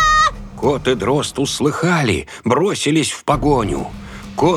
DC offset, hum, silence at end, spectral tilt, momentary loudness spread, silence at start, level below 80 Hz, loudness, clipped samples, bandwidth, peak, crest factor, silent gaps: under 0.1%; none; 0 s; -4.5 dB/octave; 7 LU; 0 s; -34 dBFS; -17 LUFS; under 0.1%; 14.5 kHz; -2 dBFS; 16 dB; none